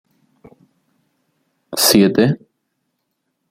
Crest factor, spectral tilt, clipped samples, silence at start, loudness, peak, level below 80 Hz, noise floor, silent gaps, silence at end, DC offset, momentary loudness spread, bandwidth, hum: 20 dB; -4 dB/octave; under 0.1%; 1.7 s; -14 LUFS; 0 dBFS; -56 dBFS; -73 dBFS; none; 1.15 s; under 0.1%; 15 LU; 16.5 kHz; none